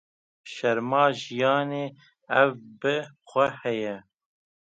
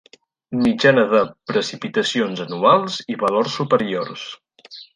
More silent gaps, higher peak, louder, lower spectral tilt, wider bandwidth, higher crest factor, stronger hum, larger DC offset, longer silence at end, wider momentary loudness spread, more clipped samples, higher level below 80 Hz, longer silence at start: neither; second, -6 dBFS vs -2 dBFS; second, -26 LUFS vs -19 LUFS; about the same, -5.5 dB/octave vs -5 dB/octave; second, 8 kHz vs 10.5 kHz; about the same, 22 dB vs 18 dB; neither; neither; first, 0.7 s vs 0.1 s; about the same, 11 LU vs 13 LU; neither; second, -74 dBFS vs -60 dBFS; about the same, 0.45 s vs 0.5 s